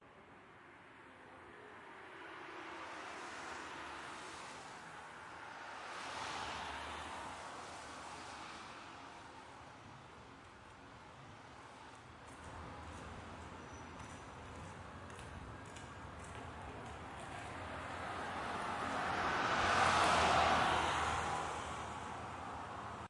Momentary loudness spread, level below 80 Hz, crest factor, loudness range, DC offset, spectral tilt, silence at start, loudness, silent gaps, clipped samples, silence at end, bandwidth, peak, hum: 22 LU; -62 dBFS; 22 dB; 19 LU; under 0.1%; -3.5 dB/octave; 0 s; -41 LUFS; none; under 0.1%; 0 s; 11.5 kHz; -20 dBFS; none